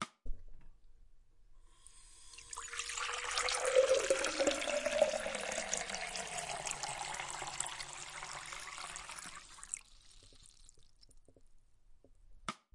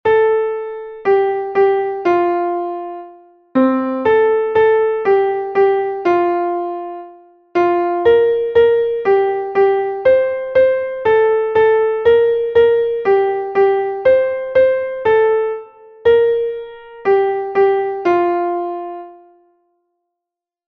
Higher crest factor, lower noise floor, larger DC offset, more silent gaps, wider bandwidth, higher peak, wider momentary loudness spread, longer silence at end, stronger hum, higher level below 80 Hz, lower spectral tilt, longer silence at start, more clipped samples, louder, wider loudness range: first, 24 dB vs 14 dB; second, -61 dBFS vs -84 dBFS; neither; neither; first, 11.5 kHz vs 5.2 kHz; second, -16 dBFS vs -2 dBFS; first, 17 LU vs 10 LU; second, 0.2 s vs 1.55 s; neither; about the same, -56 dBFS vs -52 dBFS; second, -1 dB/octave vs -7 dB/octave; about the same, 0 s vs 0.05 s; neither; second, -37 LUFS vs -15 LUFS; first, 16 LU vs 4 LU